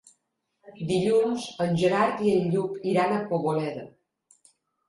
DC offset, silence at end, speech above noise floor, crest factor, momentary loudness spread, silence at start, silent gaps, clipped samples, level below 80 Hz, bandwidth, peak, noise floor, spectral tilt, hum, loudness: under 0.1%; 1 s; 52 dB; 16 dB; 7 LU; 0.65 s; none; under 0.1%; -64 dBFS; 11.5 kHz; -10 dBFS; -77 dBFS; -6.5 dB/octave; none; -25 LUFS